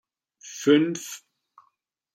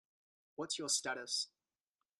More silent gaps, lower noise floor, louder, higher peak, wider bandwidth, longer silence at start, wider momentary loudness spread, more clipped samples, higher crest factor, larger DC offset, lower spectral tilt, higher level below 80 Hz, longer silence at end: neither; second, -72 dBFS vs under -90 dBFS; first, -23 LUFS vs -38 LUFS; first, -6 dBFS vs -22 dBFS; first, 15.5 kHz vs 13.5 kHz; second, 0.45 s vs 0.6 s; first, 20 LU vs 12 LU; neither; about the same, 20 dB vs 20 dB; neither; first, -4.5 dB/octave vs -0.5 dB/octave; first, -80 dBFS vs -88 dBFS; first, 0.95 s vs 0.75 s